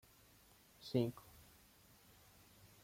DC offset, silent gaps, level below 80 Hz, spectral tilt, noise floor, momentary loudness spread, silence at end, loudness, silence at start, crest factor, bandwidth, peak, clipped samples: under 0.1%; none; -74 dBFS; -7 dB/octave; -68 dBFS; 26 LU; 1.65 s; -42 LUFS; 0.8 s; 24 dB; 16.5 kHz; -24 dBFS; under 0.1%